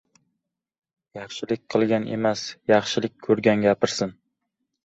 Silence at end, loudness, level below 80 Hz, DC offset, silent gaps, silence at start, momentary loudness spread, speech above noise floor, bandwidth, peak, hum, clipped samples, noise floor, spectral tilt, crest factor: 0.75 s; -23 LUFS; -62 dBFS; under 0.1%; none; 1.15 s; 13 LU; 58 dB; 8.2 kHz; -4 dBFS; none; under 0.1%; -80 dBFS; -5 dB/octave; 22 dB